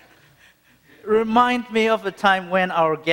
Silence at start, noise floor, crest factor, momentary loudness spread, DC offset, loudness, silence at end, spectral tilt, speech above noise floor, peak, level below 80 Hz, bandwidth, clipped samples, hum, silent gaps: 1.05 s; -55 dBFS; 20 dB; 4 LU; under 0.1%; -19 LUFS; 0 s; -5 dB/octave; 36 dB; -2 dBFS; -60 dBFS; 16.5 kHz; under 0.1%; none; none